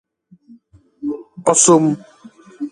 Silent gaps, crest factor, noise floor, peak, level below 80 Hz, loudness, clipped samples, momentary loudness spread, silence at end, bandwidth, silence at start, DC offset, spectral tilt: none; 18 dB; -49 dBFS; 0 dBFS; -62 dBFS; -15 LUFS; under 0.1%; 18 LU; 0.05 s; 11.5 kHz; 1 s; under 0.1%; -4 dB/octave